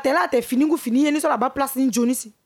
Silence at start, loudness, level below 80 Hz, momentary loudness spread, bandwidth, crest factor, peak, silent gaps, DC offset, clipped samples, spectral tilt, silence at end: 0 s; -20 LUFS; -60 dBFS; 2 LU; 17.5 kHz; 12 dB; -8 dBFS; none; under 0.1%; under 0.1%; -3.5 dB/octave; 0.15 s